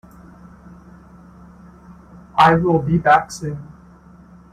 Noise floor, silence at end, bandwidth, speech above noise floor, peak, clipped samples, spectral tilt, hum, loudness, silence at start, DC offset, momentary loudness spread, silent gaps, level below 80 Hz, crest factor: -45 dBFS; 0.9 s; 13 kHz; 29 dB; -2 dBFS; under 0.1%; -6.5 dB/octave; none; -16 LUFS; 1.9 s; under 0.1%; 16 LU; none; -46 dBFS; 18 dB